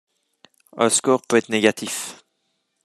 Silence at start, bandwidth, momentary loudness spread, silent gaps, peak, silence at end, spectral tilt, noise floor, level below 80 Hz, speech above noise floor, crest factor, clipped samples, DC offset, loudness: 0.75 s; 13.5 kHz; 11 LU; none; 0 dBFS; 0.7 s; -3 dB/octave; -72 dBFS; -70 dBFS; 52 dB; 22 dB; under 0.1%; under 0.1%; -20 LUFS